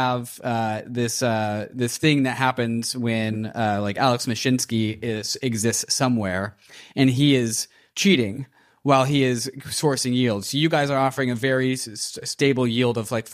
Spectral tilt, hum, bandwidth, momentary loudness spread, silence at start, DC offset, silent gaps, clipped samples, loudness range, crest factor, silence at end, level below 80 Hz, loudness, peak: -4.5 dB/octave; none; 15.5 kHz; 8 LU; 0 s; under 0.1%; none; under 0.1%; 2 LU; 18 dB; 0 s; -62 dBFS; -22 LUFS; -4 dBFS